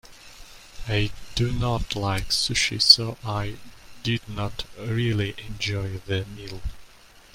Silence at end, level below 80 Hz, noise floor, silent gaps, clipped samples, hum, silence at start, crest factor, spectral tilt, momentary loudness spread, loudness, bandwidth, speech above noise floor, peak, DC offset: 0.15 s; -40 dBFS; -50 dBFS; none; under 0.1%; none; 0.05 s; 26 dB; -3.5 dB/octave; 20 LU; -24 LUFS; 16 kHz; 25 dB; 0 dBFS; under 0.1%